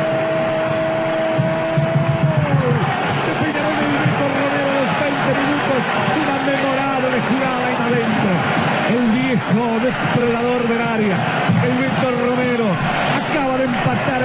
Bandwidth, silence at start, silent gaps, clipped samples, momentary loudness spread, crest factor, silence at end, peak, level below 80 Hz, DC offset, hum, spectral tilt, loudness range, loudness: 4 kHz; 0 s; none; under 0.1%; 2 LU; 12 dB; 0 s; -4 dBFS; -48 dBFS; under 0.1%; none; -10.5 dB/octave; 0 LU; -17 LUFS